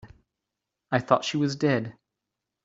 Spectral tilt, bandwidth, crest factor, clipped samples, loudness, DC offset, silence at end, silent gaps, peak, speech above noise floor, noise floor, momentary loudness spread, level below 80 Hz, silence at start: -5.5 dB/octave; 7.8 kHz; 24 dB; under 0.1%; -26 LUFS; under 0.1%; 0.75 s; none; -4 dBFS; 61 dB; -85 dBFS; 6 LU; -64 dBFS; 0.05 s